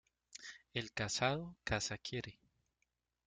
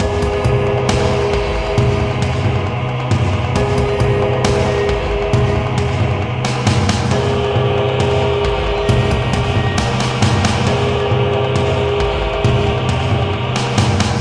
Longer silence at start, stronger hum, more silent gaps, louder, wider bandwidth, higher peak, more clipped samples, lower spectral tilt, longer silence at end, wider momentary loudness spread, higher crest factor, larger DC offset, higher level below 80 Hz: first, 0.35 s vs 0 s; neither; neither; second, -40 LUFS vs -16 LUFS; about the same, 9.6 kHz vs 10.5 kHz; second, -18 dBFS vs 0 dBFS; neither; second, -3.5 dB/octave vs -6 dB/octave; first, 0.95 s vs 0 s; first, 16 LU vs 2 LU; first, 24 dB vs 16 dB; neither; second, -62 dBFS vs -26 dBFS